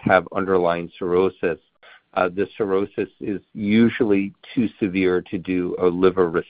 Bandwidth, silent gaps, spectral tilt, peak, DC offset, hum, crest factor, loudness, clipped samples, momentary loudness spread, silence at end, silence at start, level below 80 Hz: 4.9 kHz; none; -11 dB/octave; 0 dBFS; under 0.1%; none; 20 dB; -22 LUFS; under 0.1%; 9 LU; 0.05 s; 0.05 s; -54 dBFS